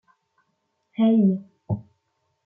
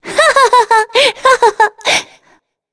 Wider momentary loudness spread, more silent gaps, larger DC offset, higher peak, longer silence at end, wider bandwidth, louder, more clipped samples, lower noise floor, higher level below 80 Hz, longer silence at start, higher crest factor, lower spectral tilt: first, 13 LU vs 5 LU; neither; neither; second, -10 dBFS vs 0 dBFS; about the same, 0.65 s vs 0.7 s; second, 3.6 kHz vs 11 kHz; second, -23 LUFS vs -10 LUFS; neither; first, -74 dBFS vs -53 dBFS; second, -64 dBFS vs -52 dBFS; first, 1 s vs 0.05 s; about the same, 14 dB vs 12 dB; first, -11.5 dB/octave vs 0 dB/octave